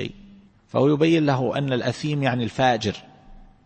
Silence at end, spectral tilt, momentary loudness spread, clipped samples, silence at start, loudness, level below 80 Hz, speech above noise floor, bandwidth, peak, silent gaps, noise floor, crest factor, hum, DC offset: 0.25 s; -6.5 dB/octave; 10 LU; under 0.1%; 0 s; -22 LUFS; -52 dBFS; 29 dB; 8.6 kHz; -6 dBFS; none; -50 dBFS; 16 dB; none; under 0.1%